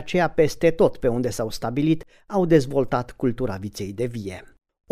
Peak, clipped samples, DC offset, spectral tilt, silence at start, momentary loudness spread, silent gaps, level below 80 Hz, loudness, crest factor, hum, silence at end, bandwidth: -6 dBFS; under 0.1%; under 0.1%; -6.5 dB/octave; 0 s; 11 LU; none; -44 dBFS; -23 LUFS; 18 dB; none; 0.45 s; 15.5 kHz